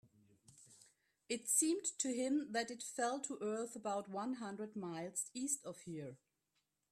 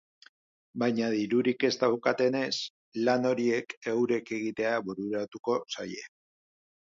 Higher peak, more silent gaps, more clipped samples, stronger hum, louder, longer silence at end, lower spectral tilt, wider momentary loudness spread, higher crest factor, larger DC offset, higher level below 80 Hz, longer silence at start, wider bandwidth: second, -22 dBFS vs -12 dBFS; second, none vs 2.70-2.92 s, 3.77-3.82 s, 5.39-5.44 s; neither; neither; second, -40 LUFS vs -29 LUFS; about the same, 0.75 s vs 0.85 s; second, -3 dB/octave vs -5 dB/octave; about the same, 12 LU vs 10 LU; about the same, 22 dB vs 18 dB; neither; second, -86 dBFS vs -74 dBFS; second, 0.5 s vs 0.75 s; first, 15 kHz vs 7.6 kHz